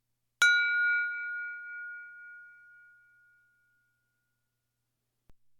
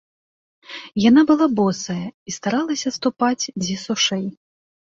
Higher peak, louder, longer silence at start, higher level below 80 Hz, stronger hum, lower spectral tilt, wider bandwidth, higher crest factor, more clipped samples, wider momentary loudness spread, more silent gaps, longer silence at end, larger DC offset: second, -12 dBFS vs -4 dBFS; second, -27 LUFS vs -20 LUFS; second, 0.4 s vs 0.7 s; second, -78 dBFS vs -58 dBFS; neither; second, 3.5 dB/octave vs -4 dB/octave; first, 16.5 kHz vs 7.8 kHz; first, 22 dB vs 16 dB; neither; first, 24 LU vs 15 LU; second, none vs 2.14-2.26 s; second, 0.25 s vs 0.5 s; neither